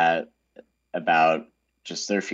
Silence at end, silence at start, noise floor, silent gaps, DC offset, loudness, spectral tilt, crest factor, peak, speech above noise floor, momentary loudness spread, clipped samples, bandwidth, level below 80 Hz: 0 s; 0 s; -53 dBFS; none; under 0.1%; -24 LUFS; -3.5 dB/octave; 16 dB; -8 dBFS; 30 dB; 19 LU; under 0.1%; 8 kHz; -76 dBFS